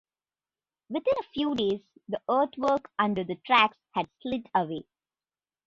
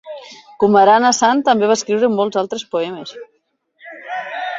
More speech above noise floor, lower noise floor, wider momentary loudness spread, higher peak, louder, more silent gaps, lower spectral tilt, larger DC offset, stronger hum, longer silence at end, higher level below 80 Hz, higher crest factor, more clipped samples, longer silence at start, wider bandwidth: first, over 62 dB vs 51 dB; first, under -90 dBFS vs -65 dBFS; second, 13 LU vs 21 LU; second, -6 dBFS vs -2 dBFS; second, -28 LUFS vs -15 LUFS; neither; first, -6 dB/octave vs -3.5 dB/octave; neither; neither; first, 0.85 s vs 0 s; about the same, -66 dBFS vs -64 dBFS; first, 22 dB vs 16 dB; neither; first, 0.9 s vs 0.05 s; about the same, 7.6 kHz vs 7.8 kHz